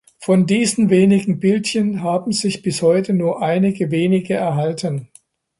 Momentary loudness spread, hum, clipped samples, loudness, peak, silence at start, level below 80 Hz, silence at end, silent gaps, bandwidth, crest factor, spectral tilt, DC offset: 7 LU; none; under 0.1%; -17 LUFS; -2 dBFS; 0.2 s; -58 dBFS; 0.55 s; none; 11.5 kHz; 14 dB; -6 dB/octave; under 0.1%